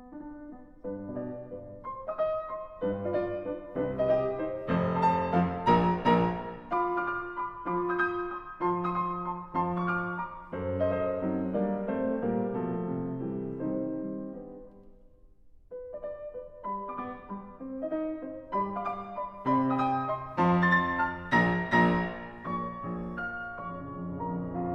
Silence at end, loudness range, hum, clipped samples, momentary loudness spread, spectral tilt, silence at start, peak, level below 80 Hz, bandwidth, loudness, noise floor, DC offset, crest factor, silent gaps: 0 s; 11 LU; none; under 0.1%; 15 LU; -8.5 dB/octave; 0 s; -10 dBFS; -54 dBFS; 6.2 kHz; -31 LUFS; -55 dBFS; under 0.1%; 20 dB; none